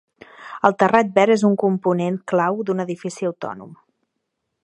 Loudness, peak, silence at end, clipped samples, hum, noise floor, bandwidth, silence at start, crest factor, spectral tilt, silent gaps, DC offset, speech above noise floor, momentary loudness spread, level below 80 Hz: -19 LUFS; 0 dBFS; 0.9 s; under 0.1%; none; -77 dBFS; 11 kHz; 0.4 s; 20 dB; -6.5 dB/octave; none; under 0.1%; 58 dB; 15 LU; -66 dBFS